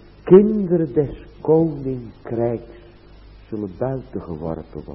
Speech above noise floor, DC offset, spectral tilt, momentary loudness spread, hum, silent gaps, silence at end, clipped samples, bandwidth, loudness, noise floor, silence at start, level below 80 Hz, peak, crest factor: 25 dB; under 0.1%; -13 dB/octave; 18 LU; none; none; 0 s; under 0.1%; 4.8 kHz; -20 LUFS; -44 dBFS; 0.25 s; -44 dBFS; 0 dBFS; 20 dB